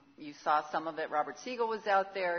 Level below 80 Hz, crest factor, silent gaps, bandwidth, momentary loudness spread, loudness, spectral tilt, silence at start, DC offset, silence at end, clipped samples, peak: -82 dBFS; 18 dB; none; 6.6 kHz; 8 LU; -33 LUFS; -1.5 dB/octave; 0.2 s; under 0.1%; 0 s; under 0.1%; -16 dBFS